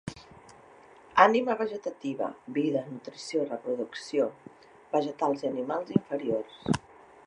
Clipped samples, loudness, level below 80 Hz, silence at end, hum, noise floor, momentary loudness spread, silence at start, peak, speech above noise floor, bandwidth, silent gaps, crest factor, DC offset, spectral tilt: under 0.1%; -29 LUFS; -64 dBFS; 0.5 s; none; -54 dBFS; 13 LU; 0.05 s; -4 dBFS; 25 dB; 11 kHz; none; 26 dB; under 0.1%; -6 dB/octave